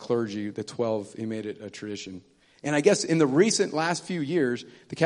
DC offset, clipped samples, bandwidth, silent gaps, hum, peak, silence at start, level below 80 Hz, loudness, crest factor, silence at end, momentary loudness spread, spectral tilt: under 0.1%; under 0.1%; 11 kHz; none; none; -6 dBFS; 0 s; -72 dBFS; -26 LUFS; 20 dB; 0 s; 15 LU; -4.5 dB/octave